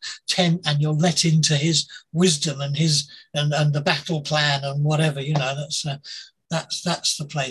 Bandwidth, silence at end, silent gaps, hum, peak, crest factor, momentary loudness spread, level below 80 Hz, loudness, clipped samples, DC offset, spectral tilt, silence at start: 12.5 kHz; 0 s; none; none; -2 dBFS; 20 dB; 10 LU; -60 dBFS; -21 LUFS; under 0.1%; under 0.1%; -4 dB/octave; 0 s